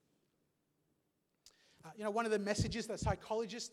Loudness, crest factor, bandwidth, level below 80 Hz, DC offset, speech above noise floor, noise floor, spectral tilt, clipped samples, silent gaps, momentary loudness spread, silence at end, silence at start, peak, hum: -38 LUFS; 20 dB; 14.5 kHz; -56 dBFS; under 0.1%; 44 dB; -82 dBFS; -5 dB/octave; under 0.1%; none; 11 LU; 0.05 s; 1.45 s; -20 dBFS; none